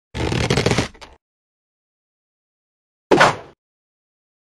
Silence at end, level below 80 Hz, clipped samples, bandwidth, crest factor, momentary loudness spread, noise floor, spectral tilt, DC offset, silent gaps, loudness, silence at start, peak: 1.1 s; -40 dBFS; under 0.1%; 13.5 kHz; 22 dB; 13 LU; under -90 dBFS; -4.5 dB/octave; under 0.1%; 1.21-3.10 s; -18 LUFS; 0.15 s; 0 dBFS